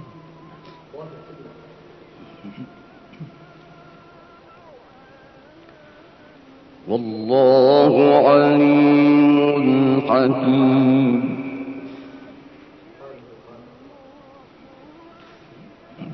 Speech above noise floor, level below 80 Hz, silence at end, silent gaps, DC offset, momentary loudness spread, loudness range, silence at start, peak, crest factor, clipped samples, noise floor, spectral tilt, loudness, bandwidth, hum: 32 dB; -66 dBFS; 0 s; none; under 0.1%; 27 LU; 19 LU; 0.95 s; -2 dBFS; 18 dB; under 0.1%; -47 dBFS; -9.5 dB/octave; -15 LUFS; 5.8 kHz; none